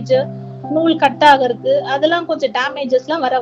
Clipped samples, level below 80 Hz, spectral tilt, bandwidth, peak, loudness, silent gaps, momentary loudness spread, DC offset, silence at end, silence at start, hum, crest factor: 0.1%; -62 dBFS; -5.5 dB/octave; 10 kHz; 0 dBFS; -15 LUFS; none; 8 LU; under 0.1%; 0 s; 0 s; none; 16 dB